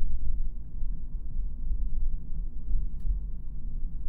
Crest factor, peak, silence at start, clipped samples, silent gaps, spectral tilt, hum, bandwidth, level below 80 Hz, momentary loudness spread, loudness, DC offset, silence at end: 12 dB; -12 dBFS; 0 s; under 0.1%; none; -11.5 dB/octave; none; 0.5 kHz; -28 dBFS; 5 LU; -38 LUFS; under 0.1%; 0 s